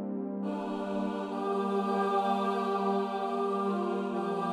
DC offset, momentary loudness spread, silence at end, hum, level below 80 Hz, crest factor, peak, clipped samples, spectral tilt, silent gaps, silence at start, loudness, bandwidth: under 0.1%; 6 LU; 0 s; none; -74 dBFS; 14 dB; -16 dBFS; under 0.1%; -7 dB/octave; none; 0 s; -31 LUFS; 12 kHz